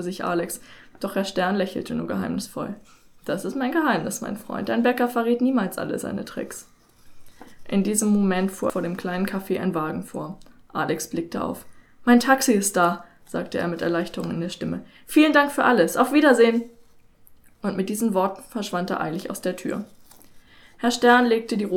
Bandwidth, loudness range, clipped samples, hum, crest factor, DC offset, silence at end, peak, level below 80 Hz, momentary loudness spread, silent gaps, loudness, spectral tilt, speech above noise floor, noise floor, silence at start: 18.5 kHz; 7 LU; under 0.1%; none; 20 dB; under 0.1%; 0 s; -4 dBFS; -58 dBFS; 16 LU; none; -23 LUFS; -4.5 dB/octave; 29 dB; -51 dBFS; 0 s